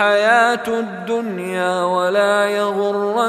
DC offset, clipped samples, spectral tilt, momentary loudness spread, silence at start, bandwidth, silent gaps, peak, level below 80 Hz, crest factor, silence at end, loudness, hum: under 0.1%; under 0.1%; -4 dB/octave; 9 LU; 0 s; 15 kHz; none; -2 dBFS; -64 dBFS; 16 dB; 0 s; -17 LUFS; none